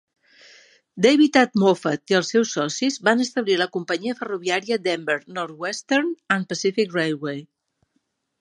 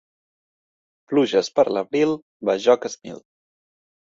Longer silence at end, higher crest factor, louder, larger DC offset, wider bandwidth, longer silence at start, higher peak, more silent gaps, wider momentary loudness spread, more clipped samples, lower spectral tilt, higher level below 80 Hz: about the same, 0.95 s vs 0.85 s; about the same, 20 dB vs 20 dB; about the same, -22 LUFS vs -21 LUFS; neither; first, 10.5 kHz vs 7.8 kHz; second, 0.95 s vs 1.1 s; about the same, -2 dBFS vs -4 dBFS; second, none vs 2.22-2.40 s; second, 11 LU vs 16 LU; neither; about the same, -4 dB/octave vs -4.5 dB/octave; second, -74 dBFS vs -68 dBFS